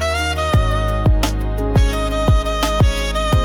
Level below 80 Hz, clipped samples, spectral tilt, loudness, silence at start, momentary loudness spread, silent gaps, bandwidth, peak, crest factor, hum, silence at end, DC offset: -20 dBFS; under 0.1%; -5.5 dB/octave; -18 LUFS; 0 s; 2 LU; none; 17.5 kHz; -6 dBFS; 10 dB; none; 0 s; under 0.1%